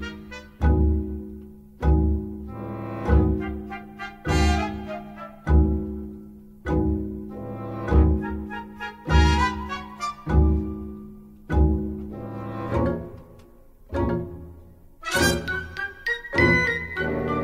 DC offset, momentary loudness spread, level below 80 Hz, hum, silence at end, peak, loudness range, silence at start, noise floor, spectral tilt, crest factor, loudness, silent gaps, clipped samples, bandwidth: under 0.1%; 16 LU; -28 dBFS; none; 0 s; -6 dBFS; 4 LU; 0 s; -49 dBFS; -6 dB/octave; 18 dB; -25 LUFS; none; under 0.1%; 14.5 kHz